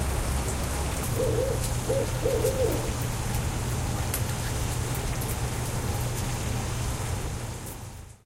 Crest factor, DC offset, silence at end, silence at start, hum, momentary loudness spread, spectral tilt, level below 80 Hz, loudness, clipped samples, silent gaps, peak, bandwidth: 16 dB; under 0.1%; 0.1 s; 0 s; none; 5 LU; -4.5 dB/octave; -34 dBFS; -29 LUFS; under 0.1%; none; -12 dBFS; 16.5 kHz